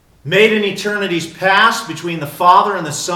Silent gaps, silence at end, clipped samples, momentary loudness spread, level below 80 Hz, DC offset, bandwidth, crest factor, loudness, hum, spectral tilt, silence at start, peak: none; 0 s; 0.1%; 11 LU; -56 dBFS; under 0.1%; 18 kHz; 14 dB; -14 LUFS; none; -3.5 dB/octave; 0.25 s; 0 dBFS